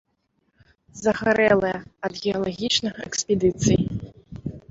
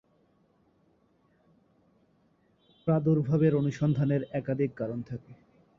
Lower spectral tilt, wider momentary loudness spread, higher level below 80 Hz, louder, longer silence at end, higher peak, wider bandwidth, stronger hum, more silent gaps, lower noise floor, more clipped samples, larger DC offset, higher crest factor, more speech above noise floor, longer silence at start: second, -4.5 dB/octave vs -9.5 dB/octave; first, 16 LU vs 12 LU; first, -48 dBFS vs -64 dBFS; first, -23 LUFS vs -28 LUFS; second, 0.1 s vs 0.45 s; first, -6 dBFS vs -14 dBFS; first, 8 kHz vs 7 kHz; neither; neither; about the same, -71 dBFS vs -68 dBFS; neither; neither; about the same, 18 dB vs 18 dB; first, 49 dB vs 40 dB; second, 0.95 s vs 2.85 s